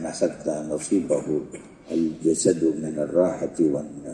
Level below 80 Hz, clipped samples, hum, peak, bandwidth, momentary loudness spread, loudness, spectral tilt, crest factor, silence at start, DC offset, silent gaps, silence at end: -58 dBFS; under 0.1%; none; -6 dBFS; 11.5 kHz; 8 LU; -24 LUFS; -5.5 dB/octave; 18 dB; 0 s; under 0.1%; none; 0 s